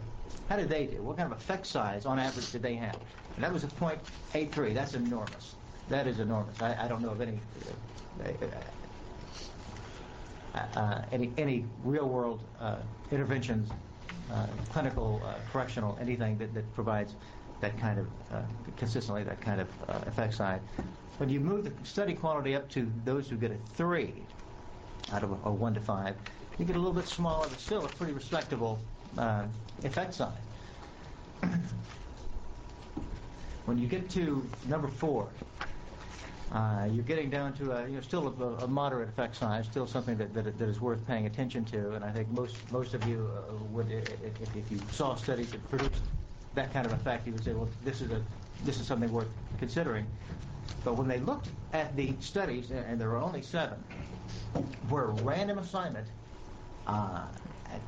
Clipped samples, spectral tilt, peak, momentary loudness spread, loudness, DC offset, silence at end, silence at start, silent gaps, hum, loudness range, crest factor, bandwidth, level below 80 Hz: under 0.1%; -6.5 dB/octave; -18 dBFS; 13 LU; -35 LUFS; under 0.1%; 0 s; 0 s; none; none; 3 LU; 18 dB; 8 kHz; -48 dBFS